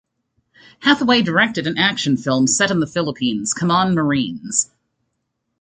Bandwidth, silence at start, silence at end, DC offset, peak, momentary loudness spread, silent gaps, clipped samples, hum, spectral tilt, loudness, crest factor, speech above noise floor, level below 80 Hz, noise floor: 9.6 kHz; 0.8 s; 0.95 s; under 0.1%; -2 dBFS; 6 LU; none; under 0.1%; none; -3.5 dB/octave; -17 LUFS; 18 dB; 56 dB; -56 dBFS; -74 dBFS